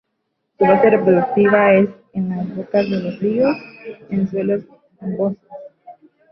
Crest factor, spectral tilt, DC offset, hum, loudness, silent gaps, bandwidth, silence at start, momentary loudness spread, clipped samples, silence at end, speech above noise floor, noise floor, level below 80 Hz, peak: 16 dB; -10 dB/octave; under 0.1%; none; -17 LUFS; none; 5.8 kHz; 0.6 s; 18 LU; under 0.1%; 0.4 s; 56 dB; -73 dBFS; -58 dBFS; -2 dBFS